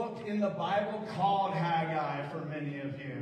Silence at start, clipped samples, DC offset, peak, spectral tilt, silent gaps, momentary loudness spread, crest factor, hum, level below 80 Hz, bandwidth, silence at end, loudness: 0 s; under 0.1%; under 0.1%; -18 dBFS; -7.5 dB/octave; none; 8 LU; 16 dB; none; -74 dBFS; 9.4 kHz; 0 s; -33 LUFS